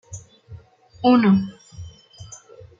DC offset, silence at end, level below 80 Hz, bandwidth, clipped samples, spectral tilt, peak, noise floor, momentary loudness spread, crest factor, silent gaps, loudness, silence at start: under 0.1%; 0.55 s; -54 dBFS; 7.6 kHz; under 0.1%; -6.5 dB/octave; -6 dBFS; -44 dBFS; 25 LU; 18 dB; none; -18 LUFS; 0.1 s